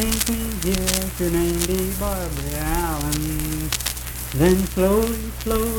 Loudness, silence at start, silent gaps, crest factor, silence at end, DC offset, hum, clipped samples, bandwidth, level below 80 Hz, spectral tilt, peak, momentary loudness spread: -22 LUFS; 0 s; none; 22 dB; 0 s; under 0.1%; none; under 0.1%; 19 kHz; -30 dBFS; -4.5 dB/octave; 0 dBFS; 7 LU